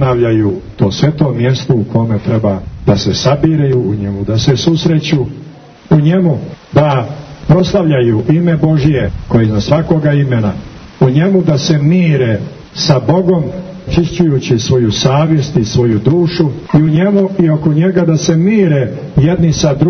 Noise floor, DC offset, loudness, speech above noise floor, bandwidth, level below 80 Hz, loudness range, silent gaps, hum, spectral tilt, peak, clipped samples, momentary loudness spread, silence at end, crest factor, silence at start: -33 dBFS; under 0.1%; -12 LUFS; 22 dB; 6.6 kHz; -34 dBFS; 2 LU; none; none; -7 dB/octave; 0 dBFS; under 0.1%; 6 LU; 0 s; 10 dB; 0 s